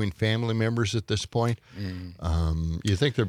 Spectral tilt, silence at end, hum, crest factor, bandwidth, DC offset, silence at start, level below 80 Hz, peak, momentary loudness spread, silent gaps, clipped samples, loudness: -6 dB/octave; 0 s; none; 16 dB; 14 kHz; under 0.1%; 0 s; -42 dBFS; -10 dBFS; 9 LU; none; under 0.1%; -28 LUFS